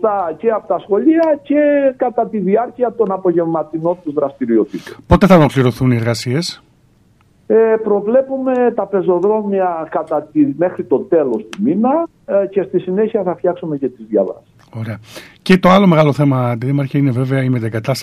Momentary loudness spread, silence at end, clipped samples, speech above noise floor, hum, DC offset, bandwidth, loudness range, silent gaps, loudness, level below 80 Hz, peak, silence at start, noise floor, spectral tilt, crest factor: 9 LU; 0 s; under 0.1%; 38 dB; none; under 0.1%; 14.5 kHz; 3 LU; none; -15 LUFS; -40 dBFS; 0 dBFS; 0 s; -52 dBFS; -7.5 dB/octave; 14 dB